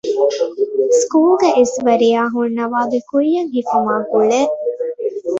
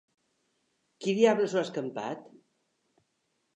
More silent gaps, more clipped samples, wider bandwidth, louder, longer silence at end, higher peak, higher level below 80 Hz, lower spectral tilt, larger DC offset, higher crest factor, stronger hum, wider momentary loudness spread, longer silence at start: neither; neither; about the same, 8 kHz vs 8.8 kHz; first, -16 LUFS vs -29 LUFS; second, 0 s vs 1.35 s; first, -2 dBFS vs -10 dBFS; first, -62 dBFS vs -88 dBFS; second, -4 dB/octave vs -5.5 dB/octave; neither; second, 14 dB vs 22 dB; neither; second, 7 LU vs 14 LU; second, 0.05 s vs 1 s